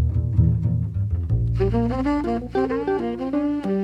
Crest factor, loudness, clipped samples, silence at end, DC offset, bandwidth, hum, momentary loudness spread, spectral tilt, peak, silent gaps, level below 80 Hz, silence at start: 14 dB; -23 LUFS; under 0.1%; 0 s; under 0.1%; 5.8 kHz; none; 5 LU; -10 dB/octave; -6 dBFS; none; -30 dBFS; 0 s